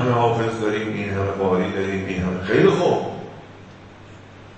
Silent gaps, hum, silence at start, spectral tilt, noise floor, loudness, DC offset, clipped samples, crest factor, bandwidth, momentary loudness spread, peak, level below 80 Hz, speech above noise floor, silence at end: none; none; 0 s; -7 dB/octave; -42 dBFS; -21 LUFS; under 0.1%; under 0.1%; 20 dB; 8.8 kHz; 17 LU; -2 dBFS; -50 dBFS; 22 dB; 0 s